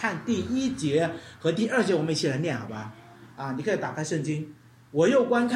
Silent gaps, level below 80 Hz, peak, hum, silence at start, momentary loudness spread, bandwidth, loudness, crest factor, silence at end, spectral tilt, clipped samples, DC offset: none; -64 dBFS; -10 dBFS; none; 0 s; 13 LU; 12 kHz; -27 LUFS; 16 dB; 0 s; -5.5 dB/octave; under 0.1%; under 0.1%